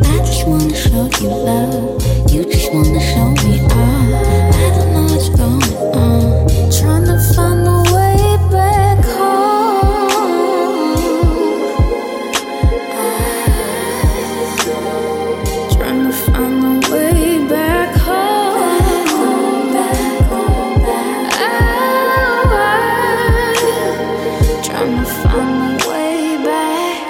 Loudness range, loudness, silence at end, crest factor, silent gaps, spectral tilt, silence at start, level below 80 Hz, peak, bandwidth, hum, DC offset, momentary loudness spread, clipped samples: 4 LU; -14 LUFS; 0 s; 12 dB; none; -5.5 dB/octave; 0 s; -20 dBFS; 0 dBFS; 17 kHz; none; under 0.1%; 5 LU; under 0.1%